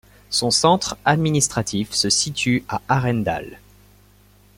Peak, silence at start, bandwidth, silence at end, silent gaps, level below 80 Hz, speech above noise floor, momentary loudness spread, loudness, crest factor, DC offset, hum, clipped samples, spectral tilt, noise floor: -2 dBFS; 0.3 s; 16.5 kHz; 1 s; none; -50 dBFS; 32 dB; 7 LU; -19 LUFS; 20 dB; under 0.1%; 50 Hz at -45 dBFS; under 0.1%; -3.5 dB/octave; -52 dBFS